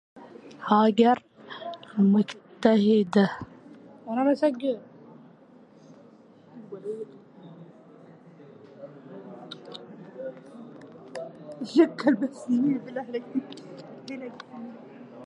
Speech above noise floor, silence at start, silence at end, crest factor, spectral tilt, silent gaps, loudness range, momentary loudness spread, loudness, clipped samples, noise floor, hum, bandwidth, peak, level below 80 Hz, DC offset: 30 dB; 0.15 s; 0 s; 22 dB; -7.5 dB/octave; none; 20 LU; 24 LU; -25 LUFS; under 0.1%; -53 dBFS; none; 9.4 kHz; -6 dBFS; -72 dBFS; under 0.1%